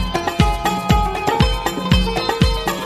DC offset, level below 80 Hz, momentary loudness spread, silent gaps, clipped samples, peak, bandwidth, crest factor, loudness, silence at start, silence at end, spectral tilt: under 0.1%; -24 dBFS; 3 LU; none; under 0.1%; -2 dBFS; 15 kHz; 16 dB; -18 LUFS; 0 s; 0 s; -5.5 dB/octave